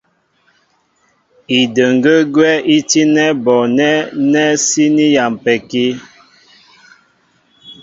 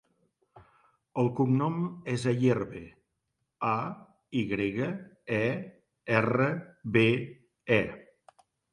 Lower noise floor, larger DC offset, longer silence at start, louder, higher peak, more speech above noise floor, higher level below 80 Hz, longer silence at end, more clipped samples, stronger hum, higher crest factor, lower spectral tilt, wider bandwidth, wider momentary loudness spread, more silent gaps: second, -58 dBFS vs -81 dBFS; neither; first, 1.5 s vs 0.55 s; first, -12 LUFS vs -29 LUFS; first, 0 dBFS vs -8 dBFS; second, 46 dB vs 53 dB; about the same, -60 dBFS vs -64 dBFS; second, 0.1 s vs 0.7 s; neither; neither; second, 14 dB vs 24 dB; second, -3.5 dB/octave vs -7.5 dB/octave; second, 7.8 kHz vs 11 kHz; second, 6 LU vs 17 LU; neither